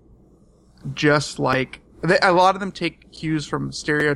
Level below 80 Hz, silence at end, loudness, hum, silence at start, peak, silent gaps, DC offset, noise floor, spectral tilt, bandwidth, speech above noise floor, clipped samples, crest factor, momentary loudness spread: -50 dBFS; 0 s; -21 LUFS; none; 0.85 s; -4 dBFS; none; under 0.1%; -53 dBFS; -5 dB/octave; 12 kHz; 33 dB; under 0.1%; 18 dB; 14 LU